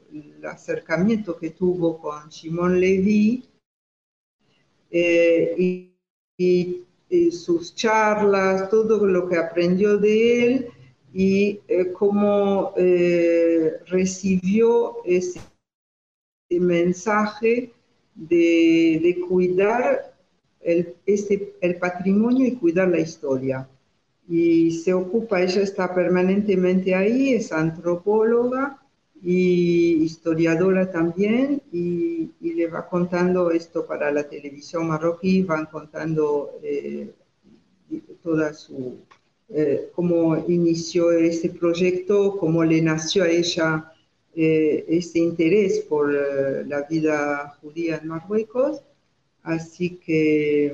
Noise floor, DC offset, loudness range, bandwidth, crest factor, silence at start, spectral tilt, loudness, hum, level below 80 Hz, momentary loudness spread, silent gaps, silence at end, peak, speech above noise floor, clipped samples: -68 dBFS; under 0.1%; 5 LU; 7.6 kHz; 14 dB; 0.1 s; -6.5 dB/octave; -21 LUFS; none; -60 dBFS; 11 LU; 3.66-4.39 s, 6.10-6.38 s, 15.74-16.49 s; 0 s; -8 dBFS; 47 dB; under 0.1%